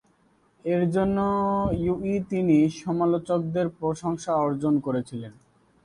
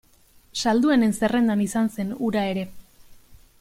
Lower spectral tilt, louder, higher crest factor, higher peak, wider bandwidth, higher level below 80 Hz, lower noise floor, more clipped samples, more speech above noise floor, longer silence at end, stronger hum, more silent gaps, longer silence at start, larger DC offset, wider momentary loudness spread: first, -8 dB/octave vs -5 dB/octave; about the same, -25 LUFS vs -23 LUFS; about the same, 16 dB vs 16 dB; about the same, -10 dBFS vs -8 dBFS; second, 11 kHz vs 15.5 kHz; about the same, -50 dBFS vs -54 dBFS; first, -63 dBFS vs -55 dBFS; neither; first, 39 dB vs 34 dB; first, 0.55 s vs 0.25 s; neither; neither; about the same, 0.65 s vs 0.55 s; neither; about the same, 8 LU vs 10 LU